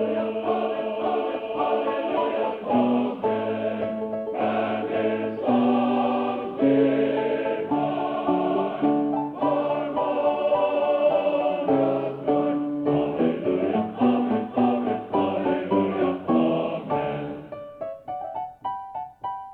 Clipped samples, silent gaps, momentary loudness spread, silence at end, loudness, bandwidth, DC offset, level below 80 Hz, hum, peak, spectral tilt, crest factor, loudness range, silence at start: under 0.1%; none; 10 LU; 0 s; -24 LUFS; 4.7 kHz; under 0.1%; -62 dBFS; none; -8 dBFS; -9.5 dB/octave; 16 dB; 2 LU; 0 s